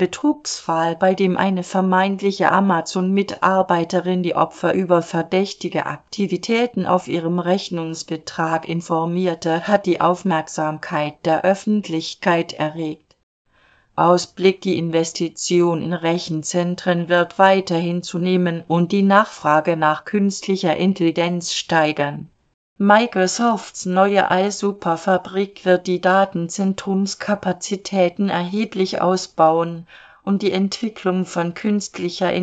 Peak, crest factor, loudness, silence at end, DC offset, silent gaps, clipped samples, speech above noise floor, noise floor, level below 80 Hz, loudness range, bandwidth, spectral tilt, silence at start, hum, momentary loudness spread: 0 dBFS; 18 dB; -19 LUFS; 0 s; under 0.1%; 13.23-13.45 s, 22.54-22.76 s; under 0.1%; 38 dB; -57 dBFS; -62 dBFS; 3 LU; 9 kHz; -5.5 dB/octave; 0 s; none; 7 LU